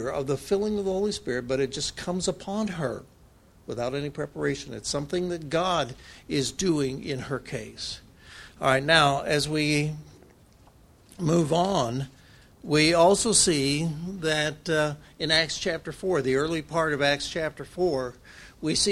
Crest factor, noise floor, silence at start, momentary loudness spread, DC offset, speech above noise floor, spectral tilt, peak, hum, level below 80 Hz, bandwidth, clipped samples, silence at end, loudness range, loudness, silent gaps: 22 dB; -55 dBFS; 0 s; 14 LU; under 0.1%; 29 dB; -4 dB/octave; -4 dBFS; none; -52 dBFS; 14.5 kHz; under 0.1%; 0 s; 7 LU; -26 LUFS; none